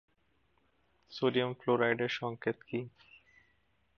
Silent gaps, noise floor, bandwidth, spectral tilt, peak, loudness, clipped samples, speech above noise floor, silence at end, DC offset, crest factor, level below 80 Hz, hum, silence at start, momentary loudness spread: none; -74 dBFS; 6.8 kHz; -6.5 dB/octave; -14 dBFS; -33 LUFS; under 0.1%; 41 dB; 1.1 s; under 0.1%; 22 dB; -78 dBFS; none; 1.1 s; 11 LU